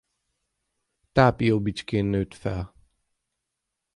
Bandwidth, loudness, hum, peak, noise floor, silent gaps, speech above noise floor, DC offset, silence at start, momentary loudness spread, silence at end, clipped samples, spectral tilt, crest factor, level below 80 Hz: 11.5 kHz; -24 LUFS; none; -4 dBFS; -83 dBFS; none; 60 dB; under 0.1%; 1.15 s; 12 LU; 1.3 s; under 0.1%; -7.5 dB/octave; 22 dB; -46 dBFS